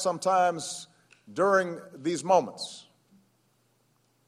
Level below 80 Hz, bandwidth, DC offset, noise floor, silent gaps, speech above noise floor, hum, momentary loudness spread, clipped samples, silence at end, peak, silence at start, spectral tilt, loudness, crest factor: -78 dBFS; 13.5 kHz; under 0.1%; -69 dBFS; none; 42 dB; none; 16 LU; under 0.1%; 1.45 s; -8 dBFS; 0 s; -4 dB/octave; -27 LUFS; 20 dB